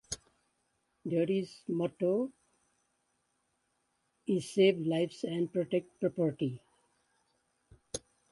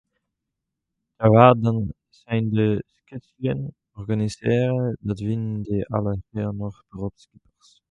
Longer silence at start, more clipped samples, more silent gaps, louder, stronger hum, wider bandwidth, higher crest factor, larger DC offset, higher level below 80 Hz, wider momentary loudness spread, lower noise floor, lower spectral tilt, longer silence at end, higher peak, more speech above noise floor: second, 0.1 s vs 1.2 s; neither; neither; second, -33 LUFS vs -22 LUFS; neither; first, 11.5 kHz vs 9.6 kHz; about the same, 22 dB vs 22 dB; neither; second, -70 dBFS vs -50 dBFS; second, 16 LU vs 19 LU; about the same, -79 dBFS vs -82 dBFS; second, -6 dB/octave vs -8.5 dB/octave; second, 0.35 s vs 0.8 s; second, -14 dBFS vs 0 dBFS; second, 47 dB vs 60 dB